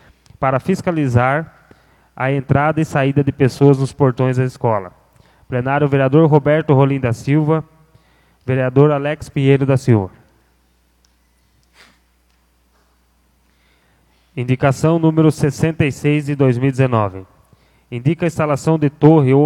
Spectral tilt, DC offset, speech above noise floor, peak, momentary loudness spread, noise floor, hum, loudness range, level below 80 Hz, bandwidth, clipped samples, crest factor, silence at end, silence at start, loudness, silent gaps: -8 dB/octave; under 0.1%; 43 dB; 0 dBFS; 9 LU; -58 dBFS; none; 5 LU; -48 dBFS; 12 kHz; under 0.1%; 16 dB; 0 s; 0.4 s; -16 LUFS; none